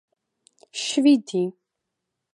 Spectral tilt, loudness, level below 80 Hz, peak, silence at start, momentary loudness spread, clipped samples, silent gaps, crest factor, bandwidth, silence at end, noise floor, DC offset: -4 dB/octave; -22 LUFS; -78 dBFS; -6 dBFS; 0.75 s; 12 LU; under 0.1%; none; 18 dB; 11 kHz; 0.8 s; -82 dBFS; under 0.1%